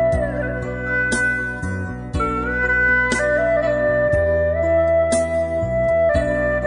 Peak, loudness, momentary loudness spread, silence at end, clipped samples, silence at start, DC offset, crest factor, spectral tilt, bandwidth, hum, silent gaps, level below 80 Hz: -6 dBFS; -19 LUFS; 8 LU; 0 s; under 0.1%; 0 s; under 0.1%; 12 dB; -5.5 dB/octave; 11 kHz; none; none; -32 dBFS